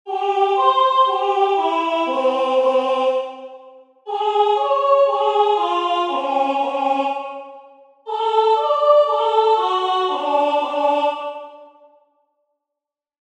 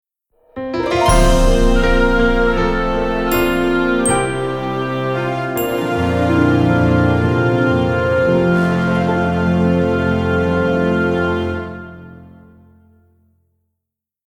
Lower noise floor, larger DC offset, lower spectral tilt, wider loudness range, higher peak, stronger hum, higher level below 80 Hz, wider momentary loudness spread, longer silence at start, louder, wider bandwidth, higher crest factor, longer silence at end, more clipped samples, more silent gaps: first, -85 dBFS vs -81 dBFS; neither; second, -2 dB/octave vs -6 dB/octave; about the same, 3 LU vs 5 LU; about the same, -2 dBFS vs -2 dBFS; neither; second, -82 dBFS vs -24 dBFS; first, 13 LU vs 7 LU; second, 0.05 s vs 0.55 s; about the same, -18 LUFS vs -16 LUFS; second, 9.6 kHz vs 18 kHz; about the same, 16 dB vs 14 dB; second, 1.55 s vs 2 s; neither; neither